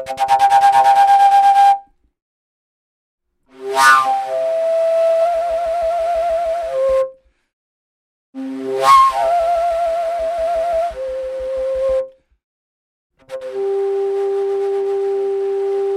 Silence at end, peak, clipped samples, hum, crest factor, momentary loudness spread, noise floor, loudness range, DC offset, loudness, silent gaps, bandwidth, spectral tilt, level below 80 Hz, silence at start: 0 s; 0 dBFS; under 0.1%; none; 16 dB; 13 LU; under -90 dBFS; 8 LU; under 0.1%; -15 LUFS; 2.22-3.18 s, 7.53-8.33 s, 12.44-13.10 s; 15.5 kHz; -2.5 dB/octave; -48 dBFS; 0 s